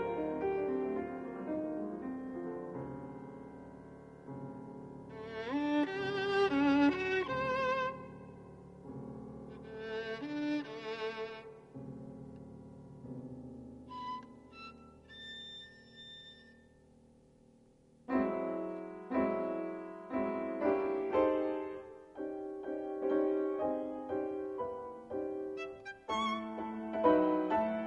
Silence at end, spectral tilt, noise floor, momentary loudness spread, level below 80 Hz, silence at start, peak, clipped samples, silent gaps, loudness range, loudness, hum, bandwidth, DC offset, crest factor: 0 s; -6.5 dB/octave; -64 dBFS; 20 LU; -66 dBFS; 0 s; -16 dBFS; under 0.1%; none; 15 LU; -36 LUFS; none; 8.4 kHz; under 0.1%; 22 dB